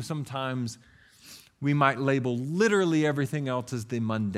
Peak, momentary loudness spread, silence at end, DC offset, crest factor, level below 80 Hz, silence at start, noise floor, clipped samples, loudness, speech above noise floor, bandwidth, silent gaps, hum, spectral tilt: -6 dBFS; 10 LU; 0 s; under 0.1%; 22 dB; -68 dBFS; 0 s; -52 dBFS; under 0.1%; -27 LUFS; 25 dB; 14.5 kHz; none; none; -6 dB/octave